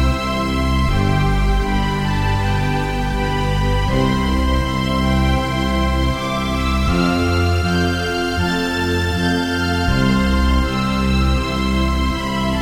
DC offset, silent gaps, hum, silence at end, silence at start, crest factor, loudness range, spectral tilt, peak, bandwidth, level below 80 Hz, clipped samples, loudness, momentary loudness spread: 0.3%; none; none; 0 s; 0 s; 12 dB; 1 LU; -6 dB/octave; -4 dBFS; 16 kHz; -22 dBFS; under 0.1%; -18 LUFS; 3 LU